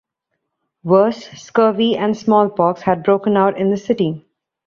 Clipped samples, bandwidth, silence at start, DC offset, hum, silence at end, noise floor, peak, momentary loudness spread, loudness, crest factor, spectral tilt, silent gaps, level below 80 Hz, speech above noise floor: under 0.1%; 7.4 kHz; 0.85 s; under 0.1%; none; 0.5 s; -75 dBFS; -2 dBFS; 7 LU; -16 LUFS; 16 dB; -7 dB/octave; none; -60 dBFS; 60 dB